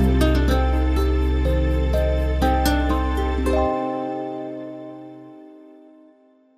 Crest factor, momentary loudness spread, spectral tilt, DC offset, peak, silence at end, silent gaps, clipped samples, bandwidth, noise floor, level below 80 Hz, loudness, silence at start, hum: 14 dB; 17 LU; -7 dB/octave; under 0.1%; -6 dBFS; 1 s; none; under 0.1%; 15 kHz; -55 dBFS; -24 dBFS; -21 LUFS; 0 s; none